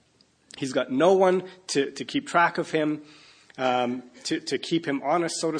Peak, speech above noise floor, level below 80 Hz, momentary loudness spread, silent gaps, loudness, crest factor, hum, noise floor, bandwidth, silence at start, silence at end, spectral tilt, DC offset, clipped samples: -8 dBFS; 38 dB; -74 dBFS; 10 LU; none; -25 LUFS; 18 dB; none; -63 dBFS; 10.5 kHz; 0.55 s; 0 s; -4.5 dB/octave; under 0.1%; under 0.1%